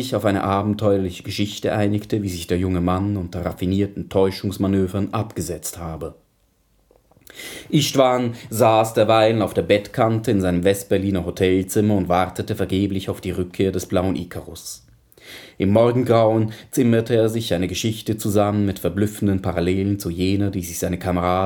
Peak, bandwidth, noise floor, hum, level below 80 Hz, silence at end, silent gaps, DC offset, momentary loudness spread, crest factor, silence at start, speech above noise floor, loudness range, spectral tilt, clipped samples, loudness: -2 dBFS; 19 kHz; -62 dBFS; none; -48 dBFS; 0 s; none; under 0.1%; 11 LU; 18 dB; 0 s; 42 dB; 6 LU; -6 dB/octave; under 0.1%; -20 LUFS